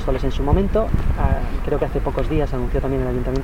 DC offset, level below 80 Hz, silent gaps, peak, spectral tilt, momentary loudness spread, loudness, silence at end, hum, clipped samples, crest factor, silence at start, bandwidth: under 0.1%; -22 dBFS; none; -6 dBFS; -8.5 dB/octave; 4 LU; -22 LUFS; 0 s; none; under 0.1%; 14 dB; 0 s; 10.5 kHz